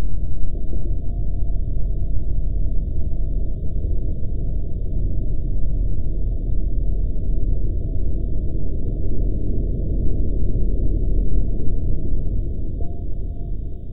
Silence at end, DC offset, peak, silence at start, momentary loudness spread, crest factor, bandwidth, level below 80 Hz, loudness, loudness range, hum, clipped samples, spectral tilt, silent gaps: 0 s; under 0.1%; -4 dBFS; 0 s; 4 LU; 12 dB; 0.7 kHz; -22 dBFS; -27 LUFS; 2 LU; none; under 0.1%; -14 dB/octave; none